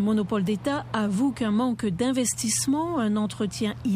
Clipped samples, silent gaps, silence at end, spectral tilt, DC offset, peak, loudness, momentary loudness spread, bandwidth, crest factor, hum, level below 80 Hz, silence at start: under 0.1%; none; 0 s; -4.5 dB/octave; under 0.1%; -12 dBFS; -25 LUFS; 4 LU; 15.5 kHz; 12 dB; none; -56 dBFS; 0 s